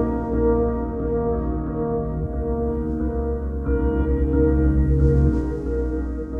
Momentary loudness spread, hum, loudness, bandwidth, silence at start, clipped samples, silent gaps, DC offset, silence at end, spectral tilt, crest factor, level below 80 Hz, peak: 7 LU; none; -22 LUFS; 2.5 kHz; 0 s; under 0.1%; none; under 0.1%; 0 s; -11.5 dB/octave; 14 dB; -24 dBFS; -6 dBFS